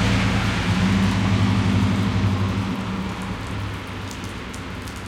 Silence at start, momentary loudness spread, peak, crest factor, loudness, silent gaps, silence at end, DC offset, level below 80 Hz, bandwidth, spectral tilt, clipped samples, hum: 0 s; 12 LU; -8 dBFS; 14 dB; -23 LUFS; none; 0 s; under 0.1%; -36 dBFS; 13.5 kHz; -6 dB/octave; under 0.1%; none